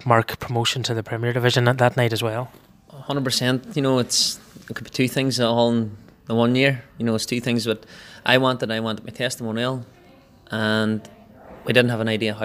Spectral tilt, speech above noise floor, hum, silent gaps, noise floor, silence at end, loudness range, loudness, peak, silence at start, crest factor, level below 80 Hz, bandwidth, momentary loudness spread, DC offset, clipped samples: -4.5 dB/octave; 29 dB; none; none; -50 dBFS; 0 s; 3 LU; -22 LUFS; 0 dBFS; 0 s; 22 dB; -58 dBFS; 15.5 kHz; 12 LU; under 0.1%; under 0.1%